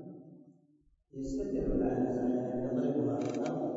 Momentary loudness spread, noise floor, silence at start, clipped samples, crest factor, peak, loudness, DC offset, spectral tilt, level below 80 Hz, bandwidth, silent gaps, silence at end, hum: 14 LU; -68 dBFS; 0 s; under 0.1%; 14 dB; -20 dBFS; -34 LUFS; under 0.1%; -8.5 dB/octave; -50 dBFS; 7.6 kHz; none; 0 s; none